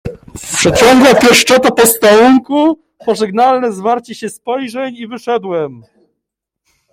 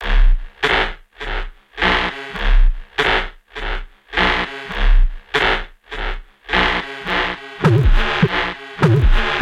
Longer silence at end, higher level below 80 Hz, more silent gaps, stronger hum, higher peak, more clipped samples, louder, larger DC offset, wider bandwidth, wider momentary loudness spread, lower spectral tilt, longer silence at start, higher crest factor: first, 1.15 s vs 0 s; second, -42 dBFS vs -18 dBFS; neither; neither; about the same, 0 dBFS vs 0 dBFS; neither; first, -10 LUFS vs -19 LUFS; neither; first, 17 kHz vs 7.4 kHz; first, 17 LU vs 12 LU; second, -3.5 dB/octave vs -6 dB/octave; about the same, 0.05 s vs 0 s; about the same, 12 dB vs 16 dB